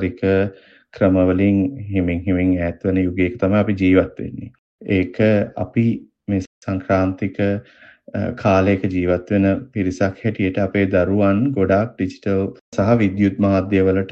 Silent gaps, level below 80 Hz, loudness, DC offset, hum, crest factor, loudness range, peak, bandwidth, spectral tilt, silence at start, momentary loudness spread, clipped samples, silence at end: 4.59-4.79 s, 6.47-6.62 s, 12.61-12.72 s; -50 dBFS; -19 LUFS; under 0.1%; none; 16 dB; 3 LU; -2 dBFS; 7.4 kHz; -8.5 dB/octave; 0 s; 9 LU; under 0.1%; 0 s